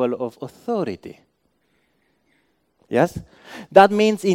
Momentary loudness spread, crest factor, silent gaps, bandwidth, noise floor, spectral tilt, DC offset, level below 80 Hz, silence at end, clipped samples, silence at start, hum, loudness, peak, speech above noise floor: 25 LU; 22 dB; none; 16 kHz; -67 dBFS; -6 dB/octave; under 0.1%; -58 dBFS; 0 s; under 0.1%; 0 s; none; -19 LUFS; 0 dBFS; 48 dB